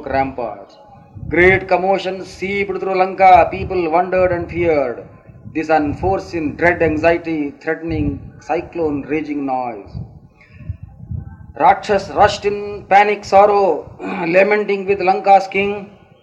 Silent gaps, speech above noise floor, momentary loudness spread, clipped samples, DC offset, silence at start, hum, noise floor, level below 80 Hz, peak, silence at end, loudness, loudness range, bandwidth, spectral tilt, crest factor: none; 26 dB; 18 LU; under 0.1%; under 0.1%; 0 s; none; -42 dBFS; -40 dBFS; 0 dBFS; 0.35 s; -16 LUFS; 8 LU; 8.6 kHz; -6.5 dB/octave; 16 dB